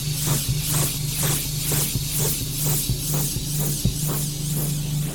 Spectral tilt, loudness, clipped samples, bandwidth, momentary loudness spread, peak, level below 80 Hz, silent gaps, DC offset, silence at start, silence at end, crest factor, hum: -3.5 dB/octave; -22 LUFS; under 0.1%; 19.5 kHz; 3 LU; -8 dBFS; -36 dBFS; none; under 0.1%; 0 s; 0 s; 16 dB; none